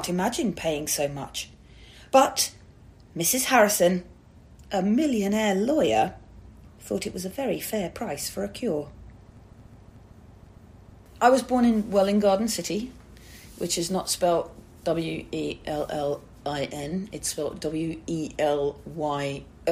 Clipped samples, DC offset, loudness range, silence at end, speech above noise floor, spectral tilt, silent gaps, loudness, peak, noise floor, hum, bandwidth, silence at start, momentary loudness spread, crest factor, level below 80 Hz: under 0.1%; under 0.1%; 8 LU; 0 s; 25 dB; -4 dB/octave; none; -26 LUFS; -6 dBFS; -50 dBFS; none; 15.5 kHz; 0 s; 12 LU; 22 dB; -52 dBFS